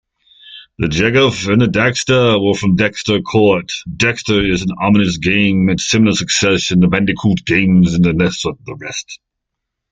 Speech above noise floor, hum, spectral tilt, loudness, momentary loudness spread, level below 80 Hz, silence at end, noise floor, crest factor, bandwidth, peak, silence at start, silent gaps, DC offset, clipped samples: 64 dB; none; -5 dB/octave; -13 LUFS; 10 LU; -40 dBFS; 0.75 s; -77 dBFS; 14 dB; 9.2 kHz; 0 dBFS; 0.45 s; none; under 0.1%; under 0.1%